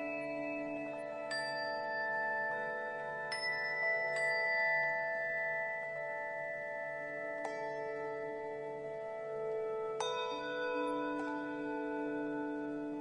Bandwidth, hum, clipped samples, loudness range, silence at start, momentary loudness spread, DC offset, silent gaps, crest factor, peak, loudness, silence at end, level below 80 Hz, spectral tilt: 10 kHz; none; under 0.1%; 6 LU; 0 s; 8 LU; under 0.1%; none; 16 dB; -24 dBFS; -37 LUFS; 0 s; -76 dBFS; -4 dB/octave